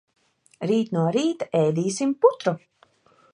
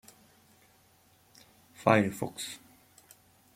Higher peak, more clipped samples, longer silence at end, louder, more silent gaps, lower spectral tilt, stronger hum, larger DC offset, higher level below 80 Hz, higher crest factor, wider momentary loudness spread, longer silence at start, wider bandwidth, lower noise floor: about the same, -4 dBFS vs -6 dBFS; neither; second, 0.75 s vs 1 s; first, -23 LUFS vs -29 LUFS; neither; about the same, -6 dB/octave vs -5.5 dB/octave; neither; neither; about the same, -72 dBFS vs -72 dBFS; second, 20 dB vs 28 dB; second, 8 LU vs 15 LU; second, 0.6 s vs 1.8 s; second, 11.5 kHz vs 16.5 kHz; second, -59 dBFS vs -64 dBFS